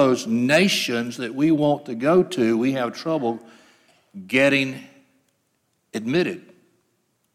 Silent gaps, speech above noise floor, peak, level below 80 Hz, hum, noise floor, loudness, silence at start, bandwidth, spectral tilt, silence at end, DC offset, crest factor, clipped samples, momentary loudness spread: none; 49 dB; -6 dBFS; -70 dBFS; none; -70 dBFS; -21 LUFS; 0 s; 15.5 kHz; -5 dB/octave; 0.95 s; under 0.1%; 18 dB; under 0.1%; 14 LU